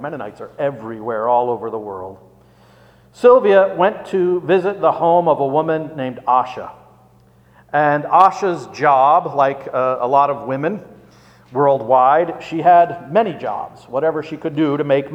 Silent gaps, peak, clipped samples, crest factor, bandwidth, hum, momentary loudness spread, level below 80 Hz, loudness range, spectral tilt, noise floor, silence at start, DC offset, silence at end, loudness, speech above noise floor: none; 0 dBFS; under 0.1%; 16 dB; 8.6 kHz; none; 14 LU; -60 dBFS; 3 LU; -7 dB/octave; -50 dBFS; 0 s; under 0.1%; 0 s; -16 LUFS; 34 dB